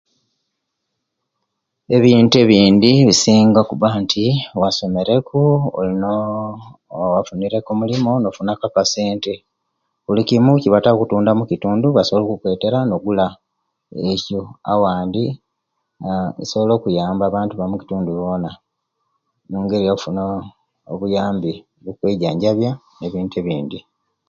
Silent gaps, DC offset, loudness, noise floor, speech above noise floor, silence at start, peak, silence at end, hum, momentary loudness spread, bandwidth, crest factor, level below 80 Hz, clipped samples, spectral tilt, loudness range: none; under 0.1%; -17 LUFS; -76 dBFS; 59 dB; 1.9 s; 0 dBFS; 0.5 s; none; 15 LU; 7.8 kHz; 18 dB; -50 dBFS; under 0.1%; -6 dB/octave; 9 LU